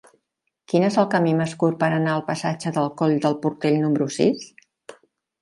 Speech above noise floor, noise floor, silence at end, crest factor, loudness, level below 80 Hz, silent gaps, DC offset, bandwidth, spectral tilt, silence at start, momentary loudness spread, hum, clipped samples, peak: 56 dB; -77 dBFS; 0.5 s; 18 dB; -22 LUFS; -66 dBFS; none; under 0.1%; 11.5 kHz; -6.5 dB/octave; 0.7 s; 5 LU; none; under 0.1%; -4 dBFS